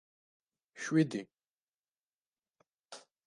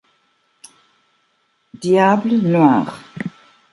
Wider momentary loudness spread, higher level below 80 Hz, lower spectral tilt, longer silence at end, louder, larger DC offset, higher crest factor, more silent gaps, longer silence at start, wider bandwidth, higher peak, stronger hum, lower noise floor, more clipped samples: first, 22 LU vs 17 LU; second, -86 dBFS vs -64 dBFS; second, -6 dB/octave vs -7.5 dB/octave; second, 0.25 s vs 0.45 s; second, -34 LUFS vs -15 LUFS; neither; about the same, 22 dB vs 18 dB; first, 1.50-1.54 s, 1.63-2.07 s, 2.26-2.33 s vs none; second, 0.75 s vs 1.8 s; about the same, 11.5 kHz vs 11.5 kHz; second, -16 dBFS vs -2 dBFS; neither; first, under -90 dBFS vs -64 dBFS; neither